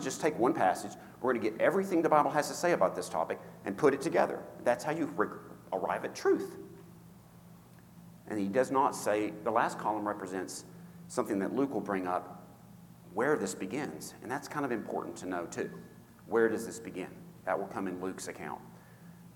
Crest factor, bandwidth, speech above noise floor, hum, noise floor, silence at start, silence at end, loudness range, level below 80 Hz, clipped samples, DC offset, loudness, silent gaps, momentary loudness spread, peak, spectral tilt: 22 dB; 19 kHz; 23 dB; none; -55 dBFS; 0 s; 0 s; 6 LU; -72 dBFS; under 0.1%; under 0.1%; -33 LUFS; none; 15 LU; -10 dBFS; -5 dB/octave